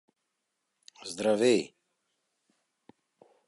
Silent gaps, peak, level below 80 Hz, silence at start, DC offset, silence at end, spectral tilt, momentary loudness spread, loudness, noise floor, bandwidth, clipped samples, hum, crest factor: none; -12 dBFS; -78 dBFS; 1.05 s; under 0.1%; 1.8 s; -4 dB/octave; 20 LU; -27 LUFS; -82 dBFS; 11.5 kHz; under 0.1%; none; 20 dB